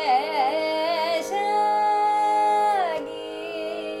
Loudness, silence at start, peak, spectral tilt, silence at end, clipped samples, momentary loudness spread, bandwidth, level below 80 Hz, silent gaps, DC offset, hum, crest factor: -23 LUFS; 0 s; -10 dBFS; -2.5 dB/octave; 0 s; under 0.1%; 10 LU; 14.5 kHz; -66 dBFS; none; under 0.1%; none; 12 dB